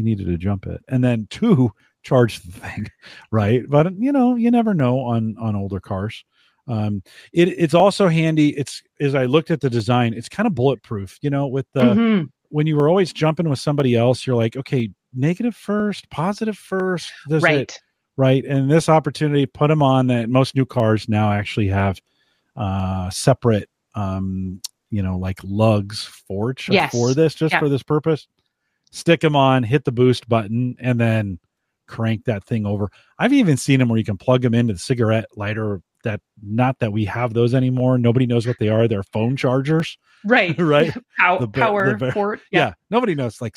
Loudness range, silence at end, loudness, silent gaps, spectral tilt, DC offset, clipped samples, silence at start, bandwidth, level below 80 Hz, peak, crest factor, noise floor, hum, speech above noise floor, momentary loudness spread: 4 LU; 0.05 s; -19 LUFS; none; -7 dB/octave; under 0.1%; under 0.1%; 0 s; 12.5 kHz; -52 dBFS; -2 dBFS; 18 dB; -71 dBFS; none; 53 dB; 11 LU